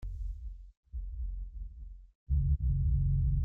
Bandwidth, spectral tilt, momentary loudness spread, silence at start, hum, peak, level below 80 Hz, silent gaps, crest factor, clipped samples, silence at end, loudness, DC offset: 0.6 kHz; -12 dB/octave; 19 LU; 0 s; none; -20 dBFS; -34 dBFS; 0.77-0.83 s, 2.15-2.26 s; 12 dB; under 0.1%; 0 s; -34 LUFS; under 0.1%